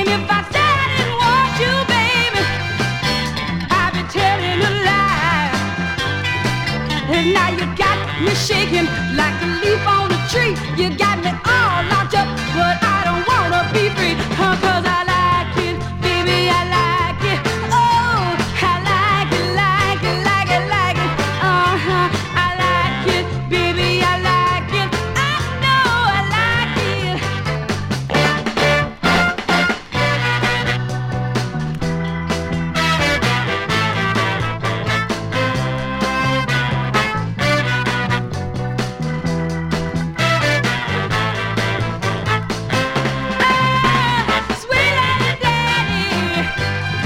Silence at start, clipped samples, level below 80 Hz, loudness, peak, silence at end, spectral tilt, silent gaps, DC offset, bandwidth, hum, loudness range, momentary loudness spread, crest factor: 0 s; under 0.1%; -36 dBFS; -17 LUFS; -2 dBFS; 0 s; -5 dB/octave; none; under 0.1%; 16.5 kHz; none; 3 LU; 6 LU; 16 dB